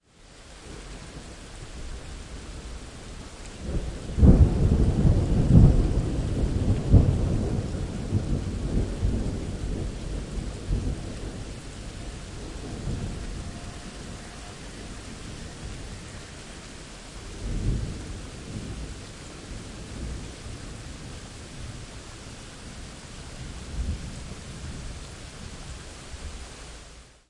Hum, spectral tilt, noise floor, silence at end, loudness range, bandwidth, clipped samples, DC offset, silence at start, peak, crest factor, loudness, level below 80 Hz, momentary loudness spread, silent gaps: none; -7 dB/octave; -50 dBFS; 0.2 s; 18 LU; 11.5 kHz; under 0.1%; under 0.1%; 0.2 s; -4 dBFS; 24 dB; -28 LUFS; -32 dBFS; 20 LU; none